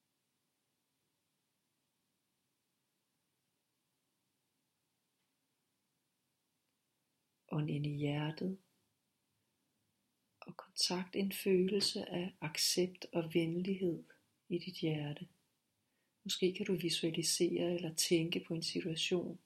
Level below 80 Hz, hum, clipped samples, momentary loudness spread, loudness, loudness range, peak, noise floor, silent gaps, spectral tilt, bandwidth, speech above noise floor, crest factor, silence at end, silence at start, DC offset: -80 dBFS; none; under 0.1%; 10 LU; -37 LUFS; 8 LU; -20 dBFS; -85 dBFS; none; -4 dB/octave; 16 kHz; 48 dB; 20 dB; 0.1 s; 7.5 s; under 0.1%